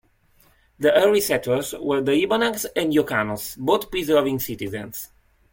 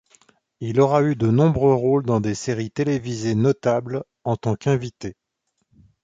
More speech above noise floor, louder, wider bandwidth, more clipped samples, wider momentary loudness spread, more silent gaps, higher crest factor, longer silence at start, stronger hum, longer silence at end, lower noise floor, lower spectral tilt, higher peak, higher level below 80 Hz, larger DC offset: second, 37 dB vs 54 dB; about the same, -22 LUFS vs -21 LUFS; first, 17 kHz vs 9 kHz; neither; about the same, 12 LU vs 12 LU; neither; about the same, 18 dB vs 18 dB; first, 0.8 s vs 0.6 s; neither; second, 0.45 s vs 0.9 s; second, -59 dBFS vs -74 dBFS; second, -4 dB/octave vs -7.5 dB/octave; about the same, -4 dBFS vs -4 dBFS; about the same, -54 dBFS vs -50 dBFS; neither